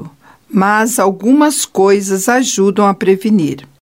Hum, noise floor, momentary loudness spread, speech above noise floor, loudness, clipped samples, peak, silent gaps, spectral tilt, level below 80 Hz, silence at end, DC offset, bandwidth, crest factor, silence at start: none; -37 dBFS; 4 LU; 25 dB; -12 LUFS; under 0.1%; 0 dBFS; none; -4.5 dB/octave; -60 dBFS; 0.3 s; 0.1%; 16.5 kHz; 12 dB; 0 s